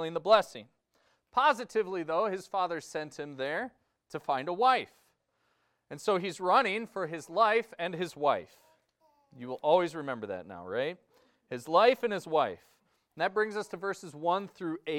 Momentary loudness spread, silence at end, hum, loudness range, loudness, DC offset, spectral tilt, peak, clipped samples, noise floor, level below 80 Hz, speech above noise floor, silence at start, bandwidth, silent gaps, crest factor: 15 LU; 0 s; none; 3 LU; -30 LUFS; under 0.1%; -4.5 dB/octave; -10 dBFS; under 0.1%; -76 dBFS; -76 dBFS; 45 dB; 0 s; 16 kHz; none; 22 dB